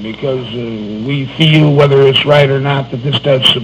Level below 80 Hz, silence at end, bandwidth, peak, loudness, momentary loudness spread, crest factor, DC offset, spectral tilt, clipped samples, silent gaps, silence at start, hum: -44 dBFS; 0 s; 10 kHz; 0 dBFS; -11 LUFS; 13 LU; 12 dB; under 0.1%; -6.5 dB/octave; 0.8%; none; 0 s; none